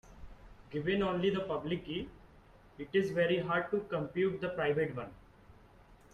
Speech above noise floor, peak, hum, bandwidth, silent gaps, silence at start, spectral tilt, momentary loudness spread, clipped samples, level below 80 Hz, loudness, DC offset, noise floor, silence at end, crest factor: 26 dB; -18 dBFS; none; 9.2 kHz; none; 0.05 s; -7 dB/octave; 12 LU; under 0.1%; -60 dBFS; -34 LUFS; under 0.1%; -59 dBFS; 0.2 s; 16 dB